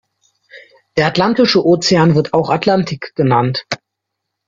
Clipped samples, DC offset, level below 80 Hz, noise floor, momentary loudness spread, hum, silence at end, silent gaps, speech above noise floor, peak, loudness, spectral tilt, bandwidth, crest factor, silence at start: under 0.1%; under 0.1%; -52 dBFS; -77 dBFS; 11 LU; none; 0.7 s; none; 64 dB; 0 dBFS; -14 LUFS; -5.5 dB/octave; 7.6 kHz; 16 dB; 0.55 s